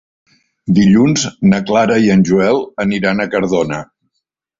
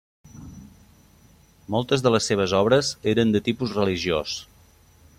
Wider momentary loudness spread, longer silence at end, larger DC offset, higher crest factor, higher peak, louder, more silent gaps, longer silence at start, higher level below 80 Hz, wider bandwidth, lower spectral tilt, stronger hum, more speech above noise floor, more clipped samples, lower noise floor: second, 7 LU vs 13 LU; about the same, 0.75 s vs 0.75 s; neither; about the same, 14 dB vs 18 dB; first, 0 dBFS vs -6 dBFS; first, -13 LUFS vs -22 LUFS; neither; first, 0.65 s vs 0.35 s; first, -46 dBFS vs -54 dBFS; second, 7.8 kHz vs 15 kHz; about the same, -6 dB/octave vs -5 dB/octave; neither; first, 61 dB vs 33 dB; neither; first, -73 dBFS vs -54 dBFS